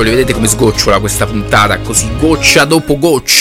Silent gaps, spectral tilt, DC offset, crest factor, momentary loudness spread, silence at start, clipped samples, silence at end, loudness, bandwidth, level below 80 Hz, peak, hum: none; -3.5 dB/octave; under 0.1%; 10 dB; 5 LU; 0 s; 0.3%; 0 s; -9 LUFS; 17.5 kHz; -24 dBFS; 0 dBFS; none